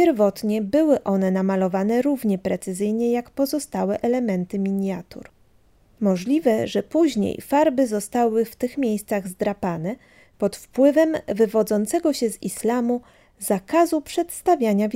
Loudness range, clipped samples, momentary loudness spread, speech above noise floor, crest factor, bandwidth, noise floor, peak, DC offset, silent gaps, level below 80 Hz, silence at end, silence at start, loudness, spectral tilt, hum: 3 LU; under 0.1%; 7 LU; 36 dB; 16 dB; 16 kHz; -57 dBFS; -6 dBFS; under 0.1%; none; -58 dBFS; 0 s; 0 s; -22 LUFS; -6 dB/octave; none